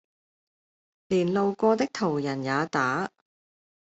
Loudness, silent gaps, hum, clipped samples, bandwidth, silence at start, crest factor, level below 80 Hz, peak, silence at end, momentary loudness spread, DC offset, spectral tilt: -26 LUFS; none; none; under 0.1%; 8.2 kHz; 1.1 s; 18 dB; -68 dBFS; -10 dBFS; 0.9 s; 5 LU; under 0.1%; -6 dB/octave